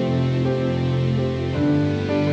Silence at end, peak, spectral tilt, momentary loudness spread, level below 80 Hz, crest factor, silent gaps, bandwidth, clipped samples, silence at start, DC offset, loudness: 0 s; -10 dBFS; -8.5 dB/octave; 2 LU; -38 dBFS; 10 dB; none; 8 kHz; under 0.1%; 0 s; under 0.1%; -21 LUFS